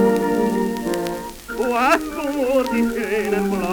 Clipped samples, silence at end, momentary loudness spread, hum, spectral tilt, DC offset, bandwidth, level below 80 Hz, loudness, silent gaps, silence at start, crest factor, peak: under 0.1%; 0 s; 7 LU; none; -5.5 dB/octave; under 0.1%; over 20 kHz; -44 dBFS; -21 LUFS; none; 0 s; 18 dB; -2 dBFS